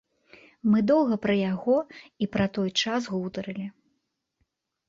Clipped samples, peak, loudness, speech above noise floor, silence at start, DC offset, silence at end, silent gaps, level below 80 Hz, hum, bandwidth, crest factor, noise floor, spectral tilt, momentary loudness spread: under 0.1%; -12 dBFS; -26 LUFS; 52 dB; 0.65 s; under 0.1%; 1.2 s; none; -60 dBFS; none; 7.6 kHz; 16 dB; -77 dBFS; -5.5 dB/octave; 13 LU